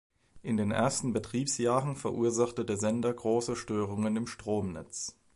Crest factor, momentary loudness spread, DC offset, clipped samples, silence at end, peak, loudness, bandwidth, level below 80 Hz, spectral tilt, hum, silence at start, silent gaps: 18 dB; 7 LU; under 0.1%; under 0.1%; 0.25 s; -14 dBFS; -31 LUFS; 11.5 kHz; -60 dBFS; -5 dB/octave; none; 0.35 s; none